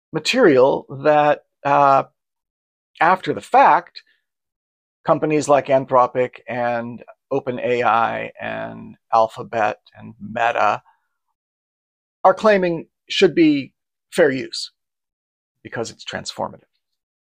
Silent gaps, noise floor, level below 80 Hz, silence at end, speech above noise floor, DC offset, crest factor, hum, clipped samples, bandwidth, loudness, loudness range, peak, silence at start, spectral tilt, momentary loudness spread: 2.50-2.94 s, 4.56-5.04 s, 11.35-12.24 s, 15.13-15.55 s; under -90 dBFS; -62 dBFS; 0.85 s; over 72 dB; under 0.1%; 18 dB; none; under 0.1%; 15 kHz; -18 LUFS; 5 LU; -2 dBFS; 0.15 s; -5 dB/octave; 15 LU